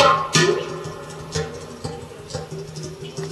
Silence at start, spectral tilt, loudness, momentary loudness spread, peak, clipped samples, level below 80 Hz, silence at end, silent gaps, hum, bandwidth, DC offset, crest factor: 0 s; -3.5 dB/octave; -24 LUFS; 16 LU; -2 dBFS; under 0.1%; -50 dBFS; 0 s; none; none; 13.5 kHz; under 0.1%; 20 dB